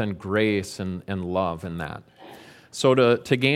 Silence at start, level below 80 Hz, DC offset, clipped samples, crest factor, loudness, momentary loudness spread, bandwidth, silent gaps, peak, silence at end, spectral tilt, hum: 0 s; -56 dBFS; under 0.1%; under 0.1%; 20 dB; -24 LUFS; 17 LU; 15.5 kHz; none; -4 dBFS; 0 s; -5.5 dB/octave; none